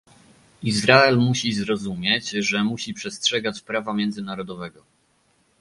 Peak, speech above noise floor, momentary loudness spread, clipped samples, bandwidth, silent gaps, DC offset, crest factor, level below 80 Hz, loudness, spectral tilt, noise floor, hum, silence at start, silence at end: 0 dBFS; 42 dB; 16 LU; under 0.1%; 11.5 kHz; none; under 0.1%; 22 dB; -58 dBFS; -21 LUFS; -4 dB/octave; -64 dBFS; none; 0.6 s; 0.9 s